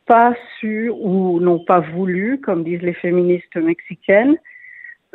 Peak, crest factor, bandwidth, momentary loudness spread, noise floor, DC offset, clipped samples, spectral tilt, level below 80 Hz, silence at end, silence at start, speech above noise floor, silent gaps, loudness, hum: 0 dBFS; 16 dB; 4.1 kHz; 11 LU; -40 dBFS; under 0.1%; under 0.1%; -10.5 dB/octave; -64 dBFS; 0.25 s; 0.1 s; 23 dB; none; -17 LUFS; none